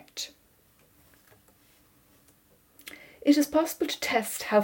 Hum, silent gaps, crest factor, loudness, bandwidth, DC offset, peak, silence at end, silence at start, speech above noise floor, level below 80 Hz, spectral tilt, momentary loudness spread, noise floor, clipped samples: none; none; 20 dB; -27 LUFS; 17.5 kHz; under 0.1%; -10 dBFS; 0 s; 0.15 s; 38 dB; -66 dBFS; -3.5 dB/octave; 22 LU; -63 dBFS; under 0.1%